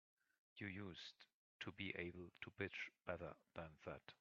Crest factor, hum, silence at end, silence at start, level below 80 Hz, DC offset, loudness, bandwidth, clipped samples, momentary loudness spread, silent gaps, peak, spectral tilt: 24 dB; none; 0.05 s; 0.55 s; -80 dBFS; under 0.1%; -53 LUFS; 7.2 kHz; under 0.1%; 8 LU; 1.34-1.59 s; -30 dBFS; -3.5 dB/octave